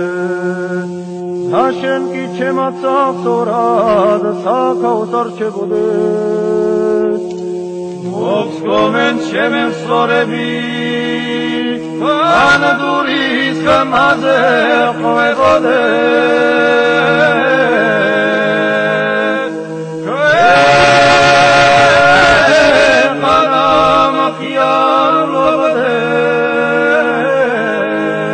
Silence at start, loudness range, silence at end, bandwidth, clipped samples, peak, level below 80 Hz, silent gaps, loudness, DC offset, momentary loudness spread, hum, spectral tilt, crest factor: 0 s; 7 LU; 0 s; 9.4 kHz; under 0.1%; 0 dBFS; -44 dBFS; none; -11 LUFS; under 0.1%; 11 LU; none; -4.5 dB/octave; 12 dB